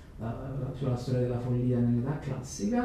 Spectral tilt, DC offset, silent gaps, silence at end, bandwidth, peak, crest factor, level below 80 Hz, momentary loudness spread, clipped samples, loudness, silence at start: -7.5 dB/octave; under 0.1%; none; 0 s; 11.5 kHz; -16 dBFS; 14 dB; -48 dBFS; 9 LU; under 0.1%; -31 LUFS; 0 s